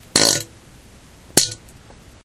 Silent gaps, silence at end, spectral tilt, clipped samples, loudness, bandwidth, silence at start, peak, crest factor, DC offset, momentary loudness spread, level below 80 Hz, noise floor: none; 0.7 s; -1 dB/octave; under 0.1%; -17 LUFS; 16.5 kHz; 0.15 s; 0 dBFS; 22 dB; under 0.1%; 21 LU; -50 dBFS; -46 dBFS